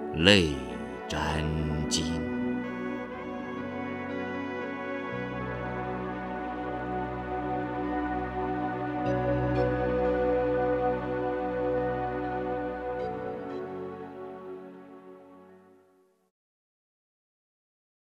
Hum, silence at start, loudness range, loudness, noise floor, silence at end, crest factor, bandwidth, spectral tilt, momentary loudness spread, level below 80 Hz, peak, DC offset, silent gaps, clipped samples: none; 0 s; 12 LU; -30 LUFS; -65 dBFS; 2.55 s; 28 dB; 14 kHz; -5 dB/octave; 11 LU; -46 dBFS; -2 dBFS; under 0.1%; none; under 0.1%